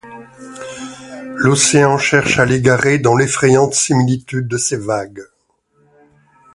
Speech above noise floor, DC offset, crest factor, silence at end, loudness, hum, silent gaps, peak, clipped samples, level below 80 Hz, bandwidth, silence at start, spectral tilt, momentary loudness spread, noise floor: 47 dB; under 0.1%; 16 dB; 1.3 s; -13 LUFS; none; none; 0 dBFS; under 0.1%; -48 dBFS; 11.5 kHz; 0.05 s; -4.5 dB/octave; 20 LU; -61 dBFS